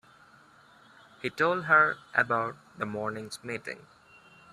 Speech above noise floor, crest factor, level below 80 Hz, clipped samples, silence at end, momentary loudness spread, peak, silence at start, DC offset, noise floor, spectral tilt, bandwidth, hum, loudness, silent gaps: 29 dB; 24 dB; -72 dBFS; under 0.1%; 0.75 s; 16 LU; -8 dBFS; 1.25 s; under 0.1%; -57 dBFS; -5 dB/octave; 13 kHz; none; -28 LUFS; none